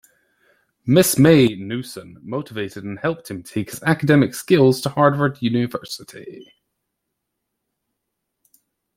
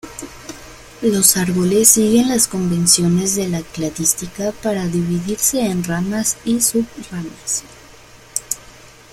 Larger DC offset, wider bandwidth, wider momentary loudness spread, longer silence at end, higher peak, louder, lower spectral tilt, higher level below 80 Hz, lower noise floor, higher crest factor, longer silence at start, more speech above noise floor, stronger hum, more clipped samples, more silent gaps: neither; about the same, 16.5 kHz vs 16.5 kHz; first, 19 LU vs 15 LU; first, 2.55 s vs 0.25 s; about the same, 0 dBFS vs 0 dBFS; about the same, -18 LUFS vs -16 LUFS; first, -5.5 dB/octave vs -3.5 dB/octave; second, -56 dBFS vs -46 dBFS; first, -78 dBFS vs -42 dBFS; about the same, 20 dB vs 18 dB; first, 0.85 s vs 0.05 s; first, 59 dB vs 26 dB; neither; neither; neither